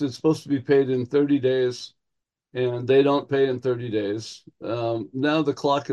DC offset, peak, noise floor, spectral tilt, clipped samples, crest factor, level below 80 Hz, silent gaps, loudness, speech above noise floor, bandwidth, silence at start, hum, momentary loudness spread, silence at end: under 0.1%; -8 dBFS; -82 dBFS; -6.5 dB/octave; under 0.1%; 16 dB; -70 dBFS; none; -23 LUFS; 60 dB; 10.5 kHz; 0 s; none; 12 LU; 0 s